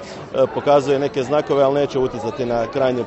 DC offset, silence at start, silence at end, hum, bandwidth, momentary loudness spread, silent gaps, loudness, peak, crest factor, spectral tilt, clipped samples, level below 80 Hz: under 0.1%; 0 s; 0 s; none; 8.2 kHz; 6 LU; none; -19 LUFS; -2 dBFS; 16 dB; -6.5 dB/octave; under 0.1%; -48 dBFS